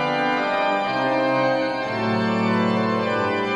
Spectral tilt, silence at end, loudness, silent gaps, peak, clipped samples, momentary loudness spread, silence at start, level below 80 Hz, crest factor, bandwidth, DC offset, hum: -6.5 dB/octave; 0 s; -21 LUFS; none; -10 dBFS; under 0.1%; 3 LU; 0 s; -60 dBFS; 12 dB; 10 kHz; under 0.1%; none